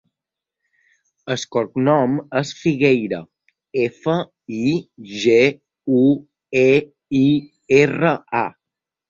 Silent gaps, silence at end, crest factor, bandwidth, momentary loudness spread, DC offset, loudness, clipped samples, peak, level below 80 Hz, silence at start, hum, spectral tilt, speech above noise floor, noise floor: none; 0.6 s; 18 dB; 7.6 kHz; 12 LU; under 0.1%; -19 LUFS; under 0.1%; -2 dBFS; -58 dBFS; 1.25 s; none; -6.5 dB/octave; 68 dB; -85 dBFS